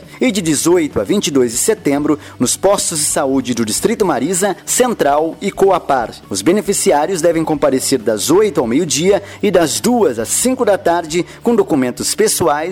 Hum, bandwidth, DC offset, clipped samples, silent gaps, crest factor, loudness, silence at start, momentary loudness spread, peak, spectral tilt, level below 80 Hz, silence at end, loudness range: none; 18 kHz; under 0.1%; under 0.1%; none; 12 dB; -14 LUFS; 0 s; 4 LU; -2 dBFS; -3.5 dB/octave; -46 dBFS; 0 s; 1 LU